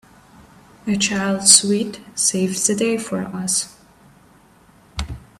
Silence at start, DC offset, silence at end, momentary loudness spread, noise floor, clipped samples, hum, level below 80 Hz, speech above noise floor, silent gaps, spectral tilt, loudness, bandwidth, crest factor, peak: 0.85 s; under 0.1%; 0.2 s; 20 LU; -51 dBFS; under 0.1%; none; -44 dBFS; 32 dB; none; -2.5 dB/octave; -17 LUFS; 16 kHz; 22 dB; 0 dBFS